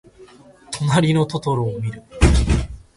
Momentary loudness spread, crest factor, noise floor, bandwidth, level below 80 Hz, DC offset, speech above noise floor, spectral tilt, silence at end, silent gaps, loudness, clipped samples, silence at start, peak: 11 LU; 20 dB; -46 dBFS; 11.5 kHz; -24 dBFS; under 0.1%; 26 dB; -6 dB/octave; 0.15 s; none; -19 LUFS; under 0.1%; 0.2 s; 0 dBFS